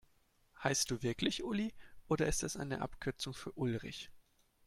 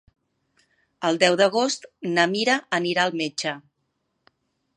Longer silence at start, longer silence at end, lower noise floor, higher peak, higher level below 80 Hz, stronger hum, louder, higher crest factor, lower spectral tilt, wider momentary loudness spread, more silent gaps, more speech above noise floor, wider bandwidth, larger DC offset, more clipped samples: second, 0.55 s vs 1 s; second, 0.45 s vs 1.15 s; about the same, -72 dBFS vs -75 dBFS; second, -18 dBFS vs -2 dBFS; first, -56 dBFS vs -74 dBFS; neither; second, -38 LUFS vs -22 LUFS; about the same, 22 dB vs 22 dB; about the same, -4 dB/octave vs -3.5 dB/octave; about the same, 9 LU vs 10 LU; neither; second, 34 dB vs 53 dB; first, 16.5 kHz vs 11.5 kHz; neither; neither